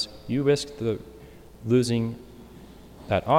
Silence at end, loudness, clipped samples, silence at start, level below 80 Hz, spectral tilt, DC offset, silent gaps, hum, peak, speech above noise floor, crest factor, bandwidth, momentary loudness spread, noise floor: 0 s; -26 LUFS; under 0.1%; 0 s; -52 dBFS; -6 dB/octave; under 0.1%; none; none; -8 dBFS; 23 dB; 18 dB; 16.5 kHz; 24 LU; -47 dBFS